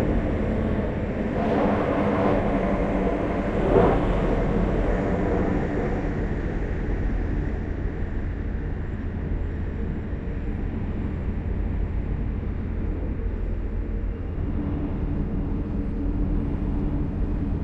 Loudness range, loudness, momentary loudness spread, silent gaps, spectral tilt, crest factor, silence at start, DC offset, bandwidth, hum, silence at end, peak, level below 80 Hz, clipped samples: 7 LU; -27 LUFS; 8 LU; none; -9.5 dB/octave; 18 dB; 0 s; under 0.1%; 6.2 kHz; none; 0 s; -6 dBFS; -30 dBFS; under 0.1%